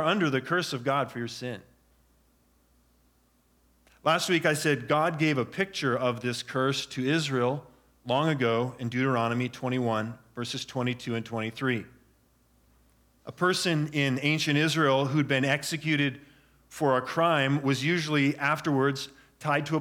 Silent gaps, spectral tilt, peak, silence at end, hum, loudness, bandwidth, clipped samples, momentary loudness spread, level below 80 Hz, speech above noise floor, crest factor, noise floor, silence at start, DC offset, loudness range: none; -5 dB/octave; -10 dBFS; 0 s; none; -27 LUFS; 18 kHz; under 0.1%; 10 LU; -68 dBFS; 39 dB; 18 dB; -66 dBFS; 0 s; under 0.1%; 7 LU